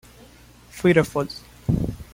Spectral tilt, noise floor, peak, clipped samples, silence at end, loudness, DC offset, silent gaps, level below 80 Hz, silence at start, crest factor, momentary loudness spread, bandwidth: -7 dB/octave; -49 dBFS; -2 dBFS; under 0.1%; 0.1 s; -23 LUFS; under 0.1%; none; -42 dBFS; 0.75 s; 22 dB; 13 LU; 16.5 kHz